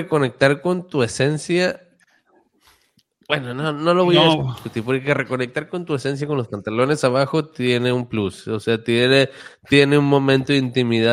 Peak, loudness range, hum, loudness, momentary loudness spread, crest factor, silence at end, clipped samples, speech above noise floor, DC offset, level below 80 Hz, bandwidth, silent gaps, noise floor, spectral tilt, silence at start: -2 dBFS; 4 LU; none; -19 LUFS; 10 LU; 18 dB; 0 s; under 0.1%; 42 dB; under 0.1%; -58 dBFS; 12.5 kHz; none; -61 dBFS; -5.5 dB/octave; 0 s